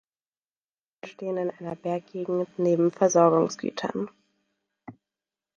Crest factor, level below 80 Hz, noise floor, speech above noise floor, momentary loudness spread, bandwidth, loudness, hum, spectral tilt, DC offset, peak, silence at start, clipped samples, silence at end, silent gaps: 20 dB; -74 dBFS; under -90 dBFS; over 65 dB; 16 LU; 7.4 kHz; -26 LUFS; none; -6 dB/octave; under 0.1%; -6 dBFS; 1.05 s; under 0.1%; 0.65 s; none